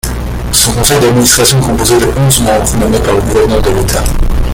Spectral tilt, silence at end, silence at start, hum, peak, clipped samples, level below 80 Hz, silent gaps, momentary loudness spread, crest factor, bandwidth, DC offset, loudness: -4 dB/octave; 0 s; 0.05 s; none; 0 dBFS; 0.3%; -16 dBFS; none; 7 LU; 8 dB; over 20 kHz; under 0.1%; -9 LUFS